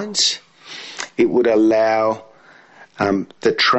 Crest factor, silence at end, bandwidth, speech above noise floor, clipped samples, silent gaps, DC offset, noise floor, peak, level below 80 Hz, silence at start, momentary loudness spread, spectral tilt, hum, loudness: 14 dB; 0 s; 8.4 kHz; 31 dB; under 0.1%; none; under 0.1%; -47 dBFS; -4 dBFS; -60 dBFS; 0 s; 15 LU; -3 dB/octave; none; -18 LUFS